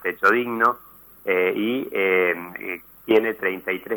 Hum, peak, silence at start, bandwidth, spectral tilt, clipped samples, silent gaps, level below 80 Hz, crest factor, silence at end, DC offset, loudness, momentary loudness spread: none; -6 dBFS; 0 s; over 20 kHz; -5.5 dB/octave; under 0.1%; none; -64 dBFS; 16 dB; 0 s; under 0.1%; -22 LUFS; 13 LU